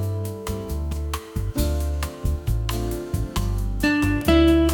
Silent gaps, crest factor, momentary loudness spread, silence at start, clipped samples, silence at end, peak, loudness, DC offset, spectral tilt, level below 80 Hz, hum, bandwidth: none; 16 dB; 11 LU; 0 s; under 0.1%; 0 s; -6 dBFS; -24 LUFS; under 0.1%; -6 dB/octave; -28 dBFS; none; 19 kHz